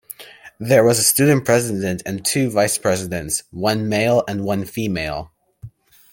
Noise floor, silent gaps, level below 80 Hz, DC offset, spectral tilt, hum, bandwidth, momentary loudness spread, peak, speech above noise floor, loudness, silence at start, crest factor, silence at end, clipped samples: -41 dBFS; none; -50 dBFS; under 0.1%; -4 dB/octave; none; 17 kHz; 11 LU; 0 dBFS; 23 dB; -18 LUFS; 0.1 s; 18 dB; 0.45 s; under 0.1%